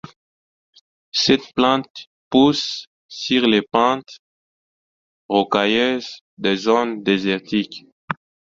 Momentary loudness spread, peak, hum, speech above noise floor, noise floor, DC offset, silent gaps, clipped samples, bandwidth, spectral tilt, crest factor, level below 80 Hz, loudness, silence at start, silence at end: 15 LU; -2 dBFS; none; over 71 dB; under -90 dBFS; under 0.1%; 1.90-1.95 s, 2.07-2.31 s, 2.87-3.09 s, 4.19-5.29 s, 6.21-6.37 s, 7.92-8.08 s; under 0.1%; 7.6 kHz; -4.5 dB/octave; 20 dB; -58 dBFS; -19 LUFS; 1.15 s; 0.4 s